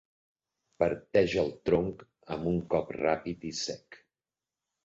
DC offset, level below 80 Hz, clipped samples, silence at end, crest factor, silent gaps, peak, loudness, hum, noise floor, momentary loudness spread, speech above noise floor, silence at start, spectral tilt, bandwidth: under 0.1%; -56 dBFS; under 0.1%; 0.9 s; 20 dB; none; -10 dBFS; -31 LUFS; none; under -90 dBFS; 10 LU; over 60 dB; 0.8 s; -5.5 dB/octave; 8 kHz